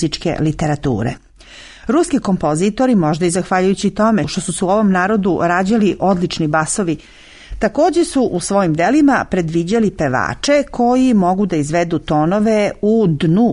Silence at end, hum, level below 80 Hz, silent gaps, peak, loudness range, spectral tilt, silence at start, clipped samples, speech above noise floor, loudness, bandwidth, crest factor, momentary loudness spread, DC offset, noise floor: 0 s; none; -40 dBFS; none; -2 dBFS; 2 LU; -6 dB/octave; 0 s; under 0.1%; 25 dB; -15 LUFS; 11 kHz; 12 dB; 5 LU; under 0.1%; -39 dBFS